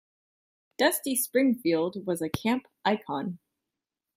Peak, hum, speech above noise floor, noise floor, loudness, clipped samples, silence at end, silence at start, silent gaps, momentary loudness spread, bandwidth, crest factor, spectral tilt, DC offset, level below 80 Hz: -10 dBFS; none; 61 dB; -88 dBFS; -28 LUFS; under 0.1%; 0.8 s; 0.8 s; none; 9 LU; 16 kHz; 18 dB; -4 dB/octave; under 0.1%; -66 dBFS